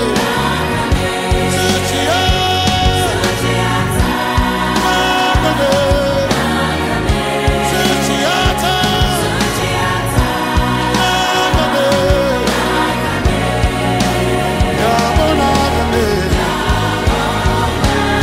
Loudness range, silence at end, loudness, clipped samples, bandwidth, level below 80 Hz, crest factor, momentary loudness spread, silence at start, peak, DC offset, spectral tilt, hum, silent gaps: 0 LU; 0 s; -14 LUFS; under 0.1%; 16 kHz; -22 dBFS; 12 dB; 3 LU; 0 s; -2 dBFS; under 0.1%; -4.5 dB/octave; none; none